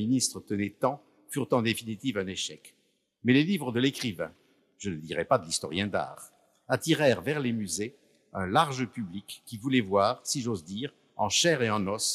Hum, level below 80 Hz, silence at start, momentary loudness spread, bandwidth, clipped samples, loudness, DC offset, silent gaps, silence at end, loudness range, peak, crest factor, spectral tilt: none; -70 dBFS; 0 s; 14 LU; 15 kHz; under 0.1%; -29 LUFS; under 0.1%; none; 0 s; 2 LU; -10 dBFS; 20 dB; -4 dB/octave